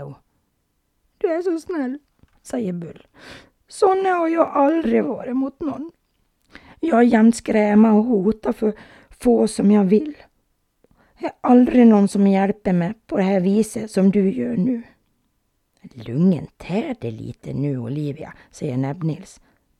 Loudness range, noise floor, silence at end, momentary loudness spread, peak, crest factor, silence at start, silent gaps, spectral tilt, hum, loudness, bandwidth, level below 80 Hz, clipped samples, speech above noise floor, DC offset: 8 LU; -69 dBFS; 0.55 s; 17 LU; -2 dBFS; 18 dB; 0 s; none; -7.5 dB/octave; none; -19 LUFS; 12 kHz; -54 dBFS; under 0.1%; 51 dB; under 0.1%